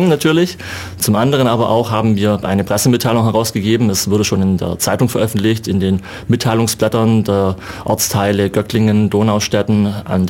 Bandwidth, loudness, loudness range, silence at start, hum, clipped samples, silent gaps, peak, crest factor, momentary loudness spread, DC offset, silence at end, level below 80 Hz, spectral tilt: 17 kHz; -15 LUFS; 1 LU; 0 s; none; under 0.1%; none; -2 dBFS; 12 dB; 4 LU; under 0.1%; 0 s; -44 dBFS; -5.5 dB/octave